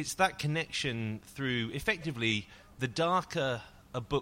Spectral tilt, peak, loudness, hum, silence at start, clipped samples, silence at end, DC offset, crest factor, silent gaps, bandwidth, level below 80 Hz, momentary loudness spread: -4.5 dB/octave; -12 dBFS; -33 LUFS; none; 0 s; under 0.1%; 0 s; under 0.1%; 20 dB; none; 16 kHz; -58 dBFS; 10 LU